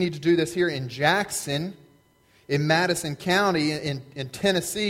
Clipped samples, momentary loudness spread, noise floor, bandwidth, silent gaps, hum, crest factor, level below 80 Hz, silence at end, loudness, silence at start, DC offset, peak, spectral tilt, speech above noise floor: under 0.1%; 8 LU; -60 dBFS; 16.5 kHz; none; none; 20 dB; -58 dBFS; 0 s; -24 LUFS; 0 s; under 0.1%; -6 dBFS; -4.5 dB/octave; 36 dB